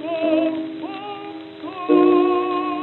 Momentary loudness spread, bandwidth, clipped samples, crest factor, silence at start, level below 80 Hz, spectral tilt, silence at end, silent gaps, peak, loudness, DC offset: 18 LU; 4.3 kHz; under 0.1%; 16 dB; 0 s; -72 dBFS; -8.5 dB/octave; 0 s; none; -4 dBFS; -19 LUFS; under 0.1%